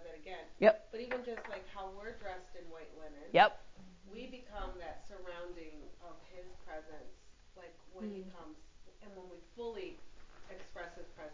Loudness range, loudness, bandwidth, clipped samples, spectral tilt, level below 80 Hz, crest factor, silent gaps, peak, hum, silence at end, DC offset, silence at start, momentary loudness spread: 16 LU; -37 LUFS; 7.6 kHz; under 0.1%; -5 dB/octave; -60 dBFS; 28 dB; none; -12 dBFS; none; 0 s; under 0.1%; 0 s; 26 LU